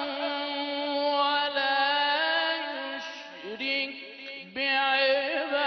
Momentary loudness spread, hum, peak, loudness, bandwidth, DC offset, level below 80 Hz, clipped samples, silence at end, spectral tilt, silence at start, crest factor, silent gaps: 15 LU; none; -14 dBFS; -27 LUFS; 6.4 kHz; under 0.1%; -78 dBFS; under 0.1%; 0 s; -2.5 dB/octave; 0 s; 14 dB; none